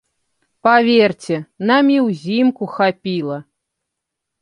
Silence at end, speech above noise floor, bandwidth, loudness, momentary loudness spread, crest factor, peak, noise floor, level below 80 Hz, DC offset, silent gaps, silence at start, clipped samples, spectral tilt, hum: 1 s; 64 dB; 10.5 kHz; -16 LUFS; 11 LU; 16 dB; 0 dBFS; -79 dBFS; -66 dBFS; under 0.1%; none; 0.65 s; under 0.1%; -6.5 dB/octave; none